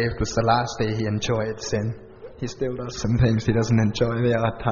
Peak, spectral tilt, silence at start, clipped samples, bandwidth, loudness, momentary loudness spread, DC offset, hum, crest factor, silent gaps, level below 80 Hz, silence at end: -6 dBFS; -6 dB/octave; 0 s; under 0.1%; 7.2 kHz; -23 LUFS; 10 LU; under 0.1%; none; 18 dB; none; -40 dBFS; 0 s